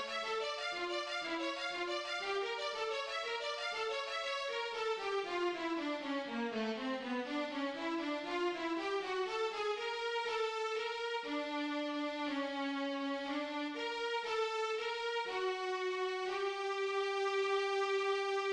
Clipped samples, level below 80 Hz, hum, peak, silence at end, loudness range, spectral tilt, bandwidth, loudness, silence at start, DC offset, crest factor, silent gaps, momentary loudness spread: under 0.1%; -76 dBFS; none; -24 dBFS; 0 s; 2 LU; -2.5 dB/octave; 10.5 kHz; -37 LUFS; 0 s; under 0.1%; 14 dB; none; 4 LU